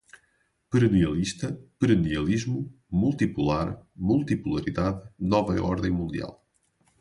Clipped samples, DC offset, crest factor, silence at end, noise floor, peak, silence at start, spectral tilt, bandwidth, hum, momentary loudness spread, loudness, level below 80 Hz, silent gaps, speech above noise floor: under 0.1%; under 0.1%; 18 dB; 0.65 s; -70 dBFS; -8 dBFS; 0.7 s; -7 dB/octave; 11.5 kHz; none; 10 LU; -26 LUFS; -44 dBFS; none; 45 dB